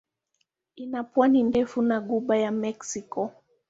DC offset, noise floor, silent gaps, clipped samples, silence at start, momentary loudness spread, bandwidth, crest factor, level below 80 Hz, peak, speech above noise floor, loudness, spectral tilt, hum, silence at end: under 0.1%; -76 dBFS; none; under 0.1%; 0.75 s; 14 LU; 8 kHz; 18 dB; -64 dBFS; -8 dBFS; 51 dB; -26 LUFS; -5.5 dB/octave; none; 0.4 s